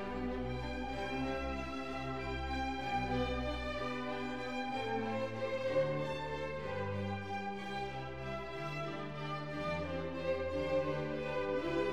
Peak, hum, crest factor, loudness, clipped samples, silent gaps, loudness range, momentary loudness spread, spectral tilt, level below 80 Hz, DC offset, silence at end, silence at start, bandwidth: -22 dBFS; none; 16 dB; -38 LUFS; under 0.1%; none; 3 LU; 6 LU; -6.5 dB/octave; -52 dBFS; 0.3%; 0 s; 0 s; 12 kHz